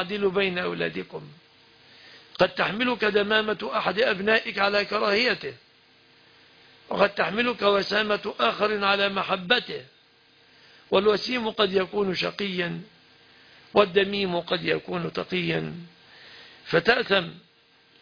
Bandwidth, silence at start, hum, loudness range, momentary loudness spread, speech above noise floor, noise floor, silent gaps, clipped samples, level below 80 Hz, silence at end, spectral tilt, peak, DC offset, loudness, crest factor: 5.4 kHz; 0 s; none; 3 LU; 13 LU; 35 dB; -59 dBFS; none; under 0.1%; -62 dBFS; 0.6 s; -5.5 dB/octave; -6 dBFS; under 0.1%; -24 LUFS; 20 dB